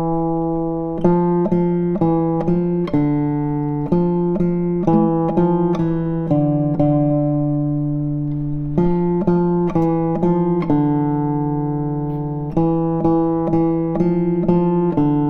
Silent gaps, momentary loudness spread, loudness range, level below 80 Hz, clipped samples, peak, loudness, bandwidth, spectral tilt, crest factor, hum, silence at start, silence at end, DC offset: none; 5 LU; 1 LU; -38 dBFS; under 0.1%; -2 dBFS; -18 LUFS; 4 kHz; -11.5 dB/octave; 14 dB; none; 0 s; 0 s; under 0.1%